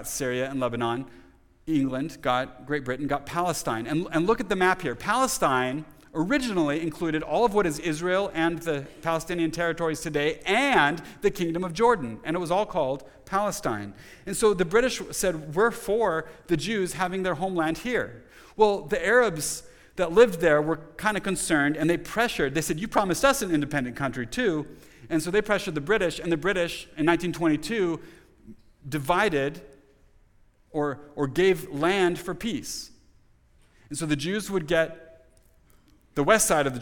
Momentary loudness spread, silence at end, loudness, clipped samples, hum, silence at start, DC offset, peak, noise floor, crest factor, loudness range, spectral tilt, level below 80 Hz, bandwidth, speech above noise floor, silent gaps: 9 LU; 0 s; -26 LUFS; under 0.1%; none; 0 s; under 0.1%; -4 dBFS; -59 dBFS; 22 dB; 5 LU; -4.5 dB/octave; -50 dBFS; 19 kHz; 34 dB; none